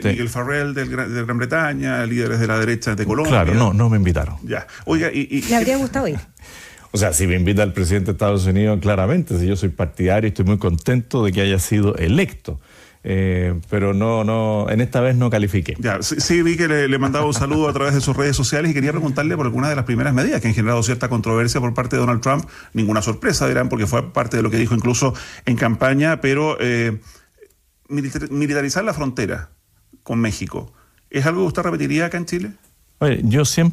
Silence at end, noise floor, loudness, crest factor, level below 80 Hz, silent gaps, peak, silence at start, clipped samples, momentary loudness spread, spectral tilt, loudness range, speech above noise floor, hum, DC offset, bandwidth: 0 s; -54 dBFS; -19 LUFS; 16 dB; -40 dBFS; none; -4 dBFS; 0 s; under 0.1%; 7 LU; -5.5 dB/octave; 4 LU; 36 dB; none; under 0.1%; 15.5 kHz